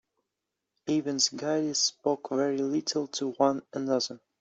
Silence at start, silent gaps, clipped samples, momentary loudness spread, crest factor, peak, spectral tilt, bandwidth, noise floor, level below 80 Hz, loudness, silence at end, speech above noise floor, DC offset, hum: 0.85 s; none; under 0.1%; 6 LU; 20 dB; -10 dBFS; -3 dB/octave; 8.2 kHz; -86 dBFS; -76 dBFS; -28 LUFS; 0.25 s; 57 dB; under 0.1%; none